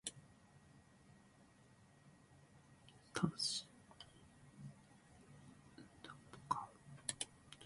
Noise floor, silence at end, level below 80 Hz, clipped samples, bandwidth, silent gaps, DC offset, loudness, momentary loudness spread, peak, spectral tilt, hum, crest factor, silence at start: -68 dBFS; 0 s; -76 dBFS; under 0.1%; 11.5 kHz; none; under 0.1%; -46 LUFS; 25 LU; -22 dBFS; -3 dB/octave; none; 28 dB; 0.05 s